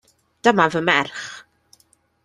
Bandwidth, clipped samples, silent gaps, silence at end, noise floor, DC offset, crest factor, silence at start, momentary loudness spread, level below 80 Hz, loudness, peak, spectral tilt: 12 kHz; under 0.1%; none; 0.85 s; -61 dBFS; under 0.1%; 20 dB; 0.45 s; 18 LU; -62 dBFS; -18 LUFS; -2 dBFS; -4.5 dB/octave